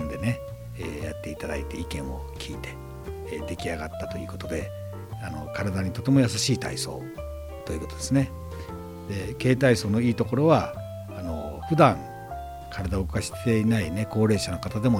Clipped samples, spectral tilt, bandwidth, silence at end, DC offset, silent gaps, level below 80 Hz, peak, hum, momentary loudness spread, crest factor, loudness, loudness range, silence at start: under 0.1%; -6 dB/octave; 17 kHz; 0 s; under 0.1%; none; -44 dBFS; -4 dBFS; none; 16 LU; 22 dB; -27 LUFS; 10 LU; 0 s